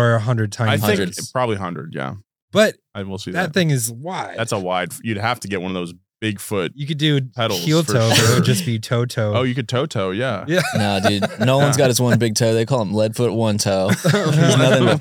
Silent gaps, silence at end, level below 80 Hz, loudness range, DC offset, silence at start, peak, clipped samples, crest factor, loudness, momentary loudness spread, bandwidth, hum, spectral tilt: 2.42-2.48 s; 0 s; -64 dBFS; 5 LU; under 0.1%; 0 s; -2 dBFS; under 0.1%; 16 dB; -19 LUFS; 11 LU; 19.5 kHz; none; -5 dB/octave